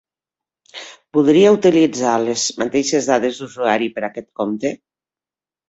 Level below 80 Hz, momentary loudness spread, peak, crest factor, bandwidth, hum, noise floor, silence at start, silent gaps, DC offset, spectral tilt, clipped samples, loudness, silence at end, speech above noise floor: -60 dBFS; 20 LU; -2 dBFS; 16 dB; 8.2 kHz; none; under -90 dBFS; 0.75 s; none; under 0.1%; -4 dB/octave; under 0.1%; -17 LUFS; 0.95 s; over 74 dB